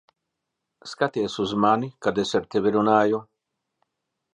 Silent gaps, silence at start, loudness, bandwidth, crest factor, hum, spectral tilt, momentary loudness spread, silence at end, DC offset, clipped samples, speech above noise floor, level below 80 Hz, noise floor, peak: none; 0.85 s; -23 LUFS; 10 kHz; 20 dB; none; -5.5 dB/octave; 9 LU; 1.1 s; under 0.1%; under 0.1%; 59 dB; -62 dBFS; -82 dBFS; -6 dBFS